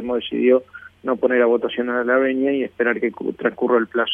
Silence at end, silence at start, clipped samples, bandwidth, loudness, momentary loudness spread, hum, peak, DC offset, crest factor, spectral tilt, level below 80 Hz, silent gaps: 0 s; 0 s; under 0.1%; 3.7 kHz; -20 LUFS; 6 LU; none; -4 dBFS; under 0.1%; 16 dB; -7.5 dB/octave; -62 dBFS; none